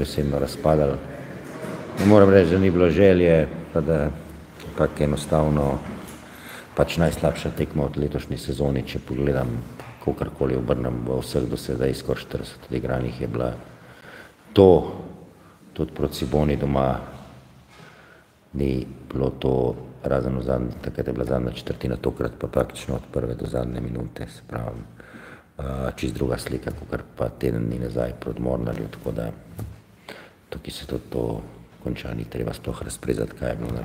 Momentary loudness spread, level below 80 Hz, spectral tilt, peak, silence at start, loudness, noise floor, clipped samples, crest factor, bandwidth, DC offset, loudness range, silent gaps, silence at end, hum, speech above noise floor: 19 LU; -38 dBFS; -7 dB/octave; 0 dBFS; 0 s; -24 LUFS; -52 dBFS; under 0.1%; 24 dB; 16 kHz; under 0.1%; 12 LU; none; 0 s; none; 29 dB